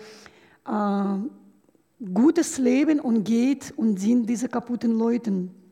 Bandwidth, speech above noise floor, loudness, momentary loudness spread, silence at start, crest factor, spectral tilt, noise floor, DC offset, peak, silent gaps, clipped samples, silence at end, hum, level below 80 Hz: 14 kHz; 38 dB; -23 LUFS; 10 LU; 0 s; 14 dB; -6 dB/octave; -61 dBFS; under 0.1%; -10 dBFS; none; under 0.1%; 0.2 s; none; -72 dBFS